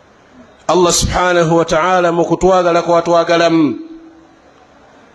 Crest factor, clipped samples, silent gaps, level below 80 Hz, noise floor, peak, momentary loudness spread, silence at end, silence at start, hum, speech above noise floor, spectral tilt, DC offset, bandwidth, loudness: 14 dB; under 0.1%; none; -34 dBFS; -45 dBFS; 0 dBFS; 4 LU; 1.15 s; 0.7 s; none; 33 dB; -4.5 dB/octave; under 0.1%; 14 kHz; -12 LUFS